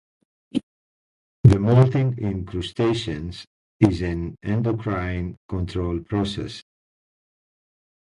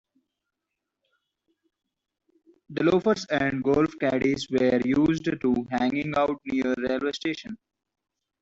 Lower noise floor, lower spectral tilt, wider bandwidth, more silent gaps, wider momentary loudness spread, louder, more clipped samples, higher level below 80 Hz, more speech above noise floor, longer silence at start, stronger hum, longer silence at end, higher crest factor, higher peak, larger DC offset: first, under -90 dBFS vs -84 dBFS; first, -8 dB/octave vs -6 dB/octave; first, 10.5 kHz vs 8 kHz; first, 0.63-1.44 s, 3.47-3.79 s, 5.37-5.49 s vs none; first, 14 LU vs 8 LU; about the same, -23 LUFS vs -25 LUFS; neither; first, -40 dBFS vs -58 dBFS; first, over 68 dB vs 60 dB; second, 0.55 s vs 2.7 s; neither; first, 1.45 s vs 0.85 s; about the same, 22 dB vs 18 dB; first, 0 dBFS vs -10 dBFS; neither